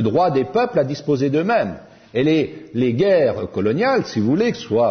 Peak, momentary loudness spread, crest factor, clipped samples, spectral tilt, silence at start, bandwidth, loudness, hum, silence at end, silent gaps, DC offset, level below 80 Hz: -4 dBFS; 6 LU; 14 dB; under 0.1%; -7 dB/octave; 0 s; 6.6 kHz; -19 LUFS; none; 0 s; none; under 0.1%; -56 dBFS